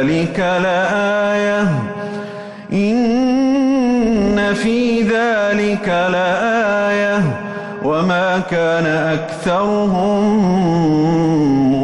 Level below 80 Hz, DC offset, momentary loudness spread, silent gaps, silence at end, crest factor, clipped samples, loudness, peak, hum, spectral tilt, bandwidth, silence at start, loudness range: -44 dBFS; under 0.1%; 5 LU; none; 0 s; 8 dB; under 0.1%; -16 LUFS; -6 dBFS; none; -6.5 dB/octave; 11 kHz; 0 s; 2 LU